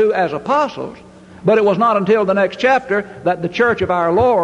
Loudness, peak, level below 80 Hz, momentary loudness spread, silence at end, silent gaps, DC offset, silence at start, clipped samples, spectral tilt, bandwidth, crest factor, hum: -16 LUFS; -2 dBFS; -46 dBFS; 7 LU; 0 s; none; under 0.1%; 0 s; under 0.1%; -6.5 dB/octave; 10 kHz; 14 dB; none